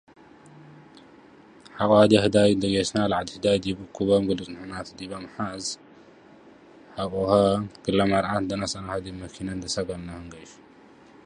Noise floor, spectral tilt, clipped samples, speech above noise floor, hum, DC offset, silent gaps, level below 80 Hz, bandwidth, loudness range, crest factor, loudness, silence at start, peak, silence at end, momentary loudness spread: -52 dBFS; -5.5 dB/octave; under 0.1%; 28 dB; none; under 0.1%; none; -52 dBFS; 11 kHz; 8 LU; 22 dB; -24 LUFS; 0.55 s; -4 dBFS; 0.75 s; 18 LU